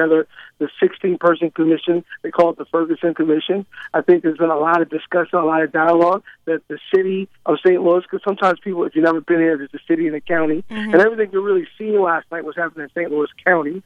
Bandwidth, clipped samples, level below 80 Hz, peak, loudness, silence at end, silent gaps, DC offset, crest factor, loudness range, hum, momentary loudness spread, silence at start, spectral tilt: 5.6 kHz; under 0.1%; -64 dBFS; 0 dBFS; -18 LUFS; 0.05 s; none; under 0.1%; 18 dB; 1 LU; none; 9 LU; 0 s; -7.5 dB/octave